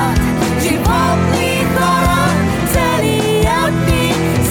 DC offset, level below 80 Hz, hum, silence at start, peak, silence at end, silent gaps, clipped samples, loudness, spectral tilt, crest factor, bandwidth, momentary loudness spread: under 0.1%; -24 dBFS; none; 0 s; -4 dBFS; 0 s; none; under 0.1%; -14 LUFS; -5 dB/octave; 10 dB; 17.5 kHz; 2 LU